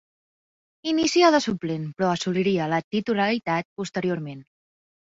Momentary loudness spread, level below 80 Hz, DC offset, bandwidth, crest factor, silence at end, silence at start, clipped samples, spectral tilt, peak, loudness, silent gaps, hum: 13 LU; -64 dBFS; under 0.1%; 8 kHz; 20 dB; 0.7 s; 0.85 s; under 0.1%; -5 dB/octave; -6 dBFS; -24 LUFS; 2.84-2.91 s, 3.65-3.76 s; none